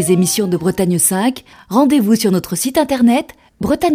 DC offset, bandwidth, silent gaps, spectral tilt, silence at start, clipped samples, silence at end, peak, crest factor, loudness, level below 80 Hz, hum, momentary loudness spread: under 0.1%; 16.5 kHz; none; -5 dB/octave; 0 s; under 0.1%; 0 s; 0 dBFS; 14 dB; -15 LUFS; -46 dBFS; none; 7 LU